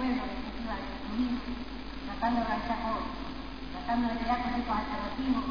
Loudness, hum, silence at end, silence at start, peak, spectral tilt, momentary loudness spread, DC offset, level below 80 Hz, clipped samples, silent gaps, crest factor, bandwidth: -33 LUFS; none; 0 s; 0 s; -16 dBFS; -6.5 dB/octave; 10 LU; 0.5%; -44 dBFS; under 0.1%; none; 16 dB; 5.2 kHz